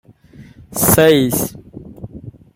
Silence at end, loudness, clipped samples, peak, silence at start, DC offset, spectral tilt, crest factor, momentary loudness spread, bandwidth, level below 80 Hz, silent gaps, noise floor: 0.25 s; -13 LUFS; under 0.1%; 0 dBFS; 0.4 s; under 0.1%; -4.5 dB/octave; 18 dB; 25 LU; 16.5 kHz; -42 dBFS; none; -42 dBFS